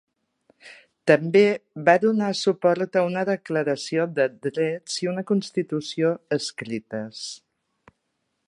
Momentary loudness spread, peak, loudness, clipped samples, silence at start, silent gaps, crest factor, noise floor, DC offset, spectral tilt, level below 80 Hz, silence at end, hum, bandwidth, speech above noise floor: 13 LU; -2 dBFS; -23 LUFS; under 0.1%; 0.65 s; none; 22 dB; -76 dBFS; under 0.1%; -5 dB/octave; -74 dBFS; 1.1 s; none; 11.5 kHz; 53 dB